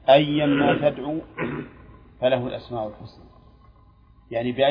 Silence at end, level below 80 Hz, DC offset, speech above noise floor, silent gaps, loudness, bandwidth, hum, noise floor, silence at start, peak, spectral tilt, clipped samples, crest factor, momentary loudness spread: 0 s; -52 dBFS; under 0.1%; 31 dB; none; -24 LUFS; 5.2 kHz; none; -53 dBFS; 0.05 s; -2 dBFS; -9 dB/octave; under 0.1%; 20 dB; 16 LU